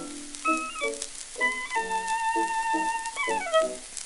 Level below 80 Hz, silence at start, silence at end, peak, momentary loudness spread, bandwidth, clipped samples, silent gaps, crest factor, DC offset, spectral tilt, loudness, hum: -56 dBFS; 0 s; 0 s; -10 dBFS; 6 LU; 12 kHz; under 0.1%; none; 18 dB; under 0.1%; -1 dB/octave; -28 LUFS; none